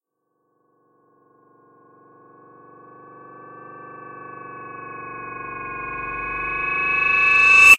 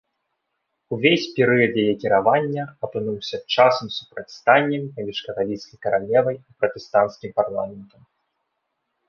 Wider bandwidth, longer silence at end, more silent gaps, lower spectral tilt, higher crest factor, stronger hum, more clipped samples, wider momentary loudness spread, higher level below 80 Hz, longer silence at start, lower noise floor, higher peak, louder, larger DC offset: first, 16 kHz vs 7 kHz; second, 0 s vs 1.25 s; neither; second, -1 dB/octave vs -6 dB/octave; about the same, 22 dB vs 20 dB; neither; neither; first, 27 LU vs 12 LU; first, -50 dBFS vs -62 dBFS; first, 3.45 s vs 0.9 s; about the same, -73 dBFS vs -76 dBFS; about the same, 0 dBFS vs -2 dBFS; first, -17 LUFS vs -21 LUFS; neither